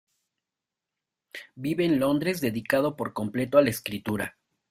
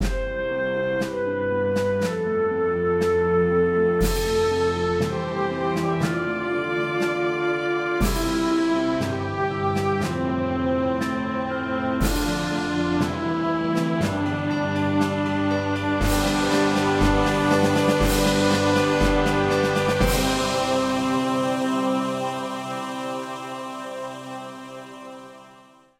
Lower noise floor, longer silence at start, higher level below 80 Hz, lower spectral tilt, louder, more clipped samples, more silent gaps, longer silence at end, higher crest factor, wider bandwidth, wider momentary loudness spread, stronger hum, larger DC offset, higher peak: first, -88 dBFS vs -51 dBFS; first, 1.35 s vs 0 s; second, -62 dBFS vs -36 dBFS; about the same, -5.5 dB/octave vs -5.5 dB/octave; second, -26 LUFS vs -23 LUFS; neither; neither; about the same, 0.4 s vs 0.5 s; first, 22 dB vs 16 dB; about the same, 16 kHz vs 16 kHz; first, 13 LU vs 9 LU; neither; neither; about the same, -6 dBFS vs -6 dBFS